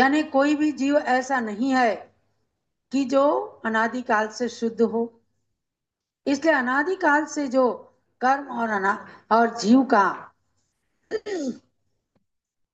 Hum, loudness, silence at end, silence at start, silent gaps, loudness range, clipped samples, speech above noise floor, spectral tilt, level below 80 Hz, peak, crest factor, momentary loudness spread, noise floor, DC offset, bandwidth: none; -23 LUFS; 1.15 s; 0 s; none; 3 LU; under 0.1%; 64 dB; -4.5 dB/octave; -76 dBFS; -6 dBFS; 18 dB; 11 LU; -86 dBFS; under 0.1%; 8.4 kHz